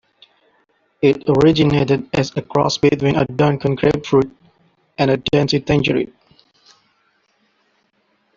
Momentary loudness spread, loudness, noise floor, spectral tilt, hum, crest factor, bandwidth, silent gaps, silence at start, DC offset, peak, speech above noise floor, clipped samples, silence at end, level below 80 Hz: 7 LU; -17 LUFS; -64 dBFS; -6.5 dB/octave; none; 16 dB; 7.4 kHz; none; 1 s; under 0.1%; -2 dBFS; 48 dB; under 0.1%; 2.3 s; -46 dBFS